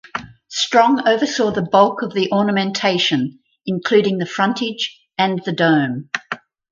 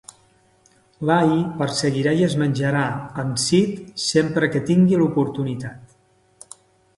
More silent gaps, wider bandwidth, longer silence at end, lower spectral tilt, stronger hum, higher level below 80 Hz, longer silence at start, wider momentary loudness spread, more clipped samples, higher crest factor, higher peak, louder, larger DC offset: neither; second, 7.6 kHz vs 11.5 kHz; second, 0.35 s vs 1.1 s; about the same, -4.5 dB/octave vs -5.5 dB/octave; neither; about the same, -60 dBFS vs -56 dBFS; second, 0.15 s vs 1 s; about the same, 12 LU vs 10 LU; neither; about the same, 18 dB vs 18 dB; first, 0 dBFS vs -4 dBFS; about the same, -18 LUFS vs -20 LUFS; neither